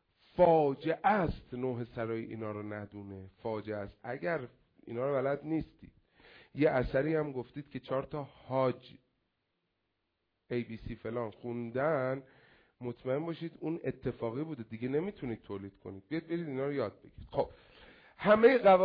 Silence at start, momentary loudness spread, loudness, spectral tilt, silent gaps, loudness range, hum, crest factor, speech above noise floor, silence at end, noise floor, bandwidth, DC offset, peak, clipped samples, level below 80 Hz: 0.35 s; 15 LU; -34 LUFS; -6 dB/octave; none; 7 LU; none; 22 dB; 50 dB; 0 s; -83 dBFS; 5.2 kHz; under 0.1%; -12 dBFS; under 0.1%; -58 dBFS